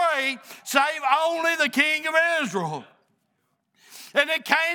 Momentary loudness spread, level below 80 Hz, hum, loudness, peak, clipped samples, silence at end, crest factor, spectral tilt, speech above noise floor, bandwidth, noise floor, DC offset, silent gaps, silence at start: 11 LU; -82 dBFS; none; -22 LUFS; -2 dBFS; under 0.1%; 0 s; 22 dB; -2.5 dB/octave; 50 dB; over 20 kHz; -73 dBFS; under 0.1%; none; 0 s